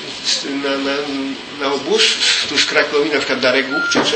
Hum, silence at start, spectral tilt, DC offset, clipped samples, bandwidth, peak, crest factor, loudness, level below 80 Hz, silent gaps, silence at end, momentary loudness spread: none; 0 s; -1.5 dB/octave; under 0.1%; under 0.1%; 8.8 kHz; 0 dBFS; 18 dB; -16 LUFS; -58 dBFS; none; 0 s; 8 LU